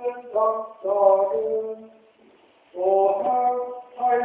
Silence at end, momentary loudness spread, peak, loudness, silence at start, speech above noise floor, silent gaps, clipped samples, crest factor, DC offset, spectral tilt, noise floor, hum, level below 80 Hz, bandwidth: 0 s; 14 LU; -6 dBFS; -22 LUFS; 0 s; 34 dB; none; under 0.1%; 16 dB; under 0.1%; -9 dB/octave; -56 dBFS; none; -72 dBFS; 3.7 kHz